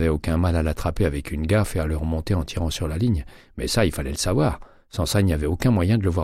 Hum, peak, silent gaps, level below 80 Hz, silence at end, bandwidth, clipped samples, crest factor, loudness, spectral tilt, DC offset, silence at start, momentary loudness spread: none; -6 dBFS; none; -32 dBFS; 0 s; 15.5 kHz; under 0.1%; 16 dB; -23 LUFS; -6 dB/octave; under 0.1%; 0 s; 7 LU